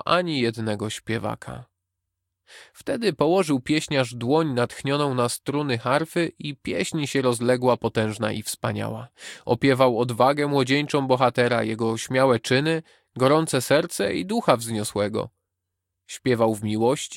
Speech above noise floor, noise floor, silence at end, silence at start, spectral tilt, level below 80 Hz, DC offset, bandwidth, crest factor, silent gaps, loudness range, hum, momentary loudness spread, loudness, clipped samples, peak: 59 dB; -82 dBFS; 0 s; 0.05 s; -5 dB/octave; -60 dBFS; under 0.1%; 17 kHz; 20 dB; none; 4 LU; none; 10 LU; -23 LUFS; under 0.1%; -2 dBFS